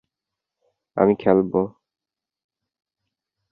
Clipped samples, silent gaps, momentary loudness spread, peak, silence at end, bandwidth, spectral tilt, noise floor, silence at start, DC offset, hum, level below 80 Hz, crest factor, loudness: under 0.1%; none; 12 LU; -2 dBFS; 1.8 s; 4.9 kHz; -11.5 dB/octave; -89 dBFS; 0.95 s; under 0.1%; none; -58 dBFS; 22 dB; -20 LUFS